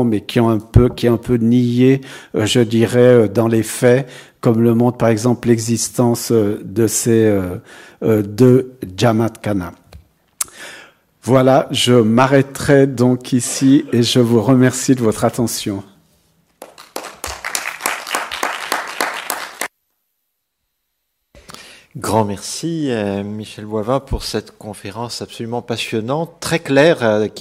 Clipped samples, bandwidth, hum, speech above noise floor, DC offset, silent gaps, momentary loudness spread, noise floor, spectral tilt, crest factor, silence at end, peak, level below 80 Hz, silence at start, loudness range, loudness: under 0.1%; 16 kHz; none; 58 dB; under 0.1%; none; 14 LU; -73 dBFS; -5.5 dB/octave; 16 dB; 0 s; 0 dBFS; -40 dBFS; 0 s; 10 LU; -16 LUFS